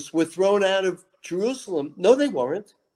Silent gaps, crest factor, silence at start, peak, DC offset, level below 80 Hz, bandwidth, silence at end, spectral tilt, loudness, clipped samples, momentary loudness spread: none; 20 dB; 0 s; -4 dBFS; under 0.1%; -74 dBFS; 12.5 kHz; 0.35 s; -4.5 dB/octave; -23 LUFS; under 0.1%; 12 LU